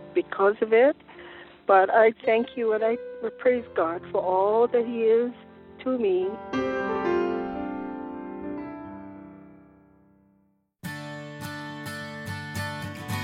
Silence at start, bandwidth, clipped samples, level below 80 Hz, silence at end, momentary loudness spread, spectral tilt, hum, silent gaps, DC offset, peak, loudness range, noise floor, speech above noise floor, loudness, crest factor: 0 s; 15.5 kHz; under 0.1%; -62 dBFS; 0 s; 18 LU; -6 dB/octave; none; none; under 0.1%; -6 dBFS; 17 LU; -67 dBFS; 44 dB; -25 LUFS; 20 dB